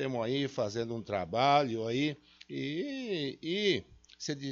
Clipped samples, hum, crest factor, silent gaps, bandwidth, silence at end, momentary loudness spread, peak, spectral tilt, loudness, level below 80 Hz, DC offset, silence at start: under 0.1%; none; 20 dB; none; 7.6 kHz; 0 s; 12 LU; -12 dBFS; -3.5 dB/octave; -33 LUFS; -68 dBFS; under 0.1%; 0 s